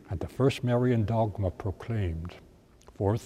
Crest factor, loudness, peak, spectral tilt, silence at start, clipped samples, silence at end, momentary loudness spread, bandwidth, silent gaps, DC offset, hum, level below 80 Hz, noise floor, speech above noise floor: 16 dB; -29 LUFS; -12 dBFS; -8 dB/octave; 0.1 s; under 0.1%; 0 s; 11 LU; 13 kHz; none; under 0.1%; none; -48 dBFS; -55 dBFS; 27 dB